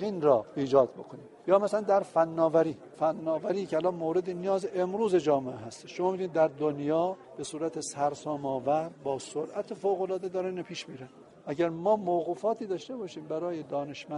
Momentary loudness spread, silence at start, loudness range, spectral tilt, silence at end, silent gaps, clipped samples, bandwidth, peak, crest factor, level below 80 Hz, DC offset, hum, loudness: 14 LU; 0 s; 5 LU; -6 dB/octave; 0 s; none; under 0.1%; 11.5 kHz; -10 dBFS; 20 dB; -72 dBFS; under 0.1%; none; -30 LUFS